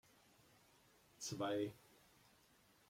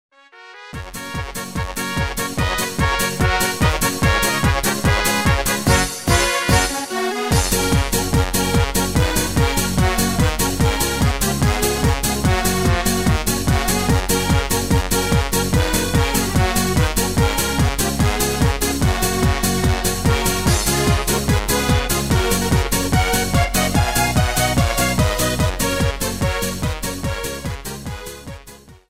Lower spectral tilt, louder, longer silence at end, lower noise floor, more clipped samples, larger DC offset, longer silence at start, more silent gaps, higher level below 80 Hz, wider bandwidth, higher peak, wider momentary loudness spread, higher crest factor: about the same, -4.5 dB/octave vs -4 dB/octave; second, -45 LUFS vs -18 LUFS; first, 1.15 s vs 0.15 s; first, -72 dBFS vs -42 dBFS; neither; neither; first, 1.2 s vs 0.35 s; neither; second, -82 dBFS vs -26 dBFS; about the same, 16.5 kHz vs 16.5 kHz; second, -30 dBFS vs -2 dBFS; first, 23 LU vs 7 LU; about the same, 20 dB vs 18 dB